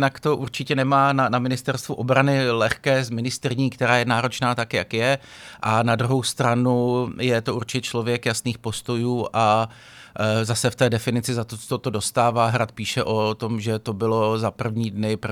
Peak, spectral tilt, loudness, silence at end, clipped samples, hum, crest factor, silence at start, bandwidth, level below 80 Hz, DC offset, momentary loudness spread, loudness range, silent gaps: -2 dBFS; -5 dB/octave; -22 LUFS; 0 s; under 0.1%; none; 20 dB; 0 s; 15.5 kHz; -56 dBFS; under 0.1%; 7 LU; 2 LU; none